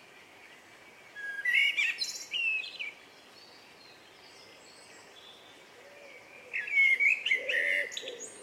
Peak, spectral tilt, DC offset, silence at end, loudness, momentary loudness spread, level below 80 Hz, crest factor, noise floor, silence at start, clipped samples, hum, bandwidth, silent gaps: -16 dBFS; 1 dB/octave; under 0.1%; 0 s; -28 LUFS; 26 LU; -84 dBFS; 18 dB; -55 dBFS; 0.15 s; under 0.1%; none; 16 kHz; none